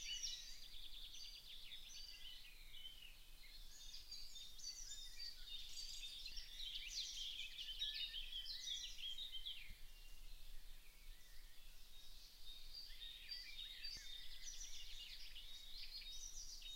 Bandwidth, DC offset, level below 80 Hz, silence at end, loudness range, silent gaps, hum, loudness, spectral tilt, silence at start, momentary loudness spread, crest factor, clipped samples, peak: 16 kHz; under 0.1%; -60 dBFS; 0 s; 9 LU; none; none; -51 LUFS; 1 dB/octave; 0 s; 16 LU; 18 dB; under 0.1%; -34 dBFS